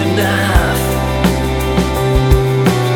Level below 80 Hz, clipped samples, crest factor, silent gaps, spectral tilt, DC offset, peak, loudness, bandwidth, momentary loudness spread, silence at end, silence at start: -20 dBFS; under 0.1%; 12 dB; none; -5.5 dB/octave; under 0.1%; 0 dBFS; -14 LUFS; 19 kHz; 3 LU; 0 s; 0 s